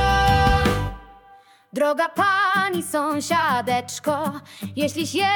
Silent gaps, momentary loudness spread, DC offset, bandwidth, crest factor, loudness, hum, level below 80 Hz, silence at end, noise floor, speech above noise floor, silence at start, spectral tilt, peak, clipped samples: none; 11 LU; under 0.1%; 18 kHz; 16 dB; -21 LUFS; none; -34 dBFS; 0 s; -51 dBFS; 29 dB; 0 s; -4.5 dB/octave; -6 dBFS; under 0.1%